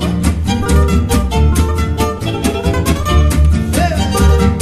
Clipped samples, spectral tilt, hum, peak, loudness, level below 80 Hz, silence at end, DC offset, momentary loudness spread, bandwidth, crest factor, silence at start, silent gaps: under 0.1%; -6 dB/octave; none; 0 dBFS; -14 LUFS; -16 dBFS; 0 s; under 0.1%; 5 LU; 14.5 kHz; 12 dB; 0 s; none